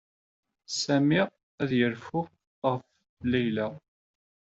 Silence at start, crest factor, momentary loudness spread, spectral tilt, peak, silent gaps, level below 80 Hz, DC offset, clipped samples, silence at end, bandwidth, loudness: 0.7 s; 18 dB; 11 LU; -5 dB/octave; -12 dBFS; 1.43-1.58 s, 2.47-2.62 s, 3.09-3.17 s; -66 dBFS; under 0.1%; under 0.1%; 0.75 s; 8 kHz; -29 LUFS